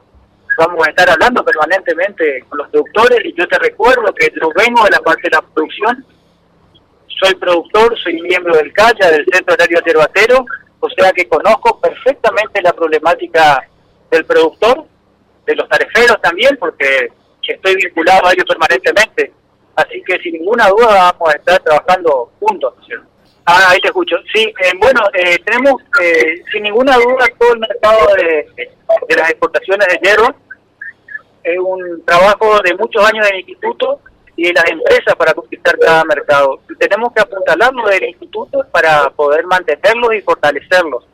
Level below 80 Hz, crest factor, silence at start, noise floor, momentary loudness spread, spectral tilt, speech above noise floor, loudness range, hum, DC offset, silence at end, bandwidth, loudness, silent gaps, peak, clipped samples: -44 dBFS; 10 dB; 0.5 s; -52 dBFS; 10 LU; -3 dB/octave; 41 dB; 3 LU; none; under 0.1%; 0.15 s; 16 kHz; -11 LUFS; none; 0 dBFS; under 0.1%